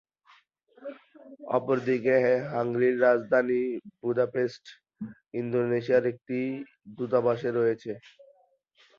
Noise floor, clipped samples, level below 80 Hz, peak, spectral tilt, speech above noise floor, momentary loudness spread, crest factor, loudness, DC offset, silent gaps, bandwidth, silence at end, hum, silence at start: -65 dBFS; under 0.1%; -72 dBFS; -10 dBFS; -8 dB/octave; 38 dB; 19 LU; 18 dB; -27 LUFS; under 0.1%; none; 7 kHz; 1 s; none; 0.8 s